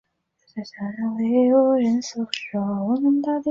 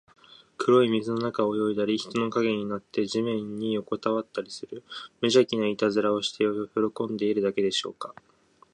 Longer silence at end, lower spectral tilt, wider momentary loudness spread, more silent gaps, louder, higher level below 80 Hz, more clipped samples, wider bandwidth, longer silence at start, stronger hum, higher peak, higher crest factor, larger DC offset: second, 0 s vs 0.6 s; about the same, -6 dB/octave vs -5 dB/octave; about the same, 15 LU vs 14 LU; neither; first, -22 LUFS vs -26 LUFS; about the same, -68 dBFS vs -70 dBFS; neither; second, 7.8 kHz vs 10.5 kHz; about the same, 0.55 s vs 0.6 s; neither; about the same, -6 dBFS vs -8 dBFS; about the same, 16 dB vs 20 dB; neither